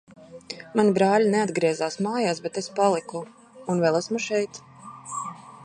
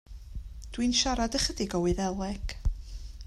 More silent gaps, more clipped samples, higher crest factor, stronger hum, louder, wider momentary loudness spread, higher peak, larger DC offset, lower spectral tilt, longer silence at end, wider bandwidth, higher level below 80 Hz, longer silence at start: neither; neither; about the same, 18 dB vs 18 dB; neither; first, -24 LUFS vs -29 LUFS; about the same, 19 LU vs 19 LU; first, -8 dBFS vs -12 dBFS; neither; about the same, -5 dB/octave vs -4 dB/octave; about the same, 0 s vs 0 s; second, 10.5 kHz vs 13.5 kHz; second, -70 dBFS vs -38 dBFS; about the same, 0.2 s vs 0.1 s